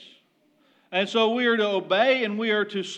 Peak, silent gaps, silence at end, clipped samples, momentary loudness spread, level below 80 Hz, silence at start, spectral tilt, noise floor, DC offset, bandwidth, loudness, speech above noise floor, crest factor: -8 dBFS; none; 0 s; under 0.1%; 5 LU; under -90 dBFS; 0 s; -4.5 dB/octave; -64 dBFS; under 0.1%; 9 kHz; -23 LUFS; 41 dB; 18 dB